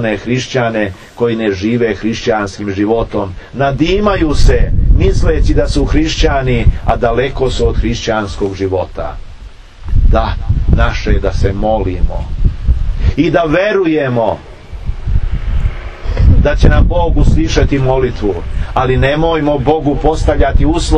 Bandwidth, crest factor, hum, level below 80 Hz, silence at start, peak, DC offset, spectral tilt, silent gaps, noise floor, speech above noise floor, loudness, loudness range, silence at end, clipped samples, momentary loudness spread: 9.6 kHz; 12 dB; none; -14 dBFS; 0 s; 0 dBFS; under 0.1%; -6.5 dB/octave; none; -31 dBFS; 20 dB; -14 LUFS; 3 LU; 0 s; 0.5%; 8 LU